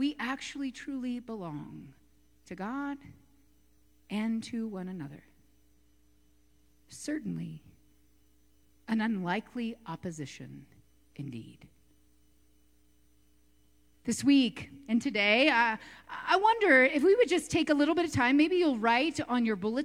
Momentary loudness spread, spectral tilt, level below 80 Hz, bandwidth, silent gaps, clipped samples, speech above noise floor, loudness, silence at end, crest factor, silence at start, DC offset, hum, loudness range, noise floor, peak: 20 LU; -4.5 dB/octave; -66 dBFS; 13.5 kHz; none; under 0.1%; 38 dB; -29 LUFS; 0 s; 22 dB; 0 s; under 0.1%; none; 18 LU; -67 dBFS; -10 dBFS